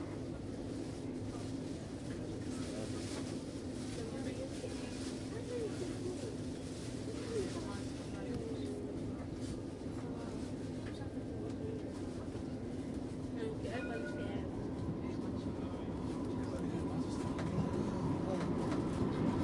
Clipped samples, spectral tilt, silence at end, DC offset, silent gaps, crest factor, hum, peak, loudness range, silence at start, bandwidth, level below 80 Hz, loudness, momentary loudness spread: under 0.1%; -6.5 dB/octave; 0 s; under 0.1%; none; 18 dB; none; -24 dBFS; 4 LU; 0 s; 11.5 kHz; -56 dBFS; -41 LUFS; 6 LU